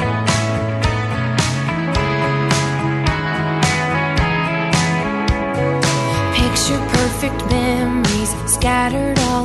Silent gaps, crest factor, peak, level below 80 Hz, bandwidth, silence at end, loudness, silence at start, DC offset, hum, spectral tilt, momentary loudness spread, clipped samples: none; 16 dB; 0 dBFS; -30 dBFS; 12.5 kHz; 0 s; -17 LUFS; 0 s; under 0.1%; none; -4.5 dB/octave; 3 LU; under 0.1%